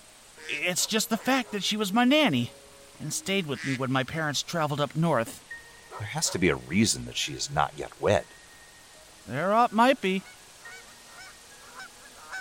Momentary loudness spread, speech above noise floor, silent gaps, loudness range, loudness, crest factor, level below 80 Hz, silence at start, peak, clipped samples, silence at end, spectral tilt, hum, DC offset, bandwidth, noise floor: 23 LU; 25 dB; none; 3 LU; -26 LUFS; 20 dB; -58 dBFS; 0.35 s; -8 dBFS; under 0.1%; 0 s; -4 dB/octave; none; under 0.1%; 16.5 kHz; -51 dBFS